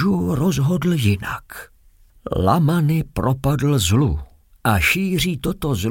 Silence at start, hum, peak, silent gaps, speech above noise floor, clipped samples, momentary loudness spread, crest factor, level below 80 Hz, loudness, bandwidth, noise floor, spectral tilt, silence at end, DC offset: 0 s; none; -4 dBFS; none; 33 dB; under 0.1%; 12 LU; 14 dB; -36 dBFS; -19 LUFS; 17 kHz; -51 dBFS; -5.5 dB/octave; 0 s; under 0.1%